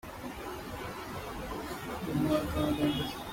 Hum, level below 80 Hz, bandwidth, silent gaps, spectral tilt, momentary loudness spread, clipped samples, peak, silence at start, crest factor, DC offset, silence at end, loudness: none; -48 dBFS; 16.5 kHz; none; -5.5 dB/octave; 11 LU; under 0.1%; -16 dBFS; 0.05 s; 18 dB; under 0.1%; 0 s; -34 LUFS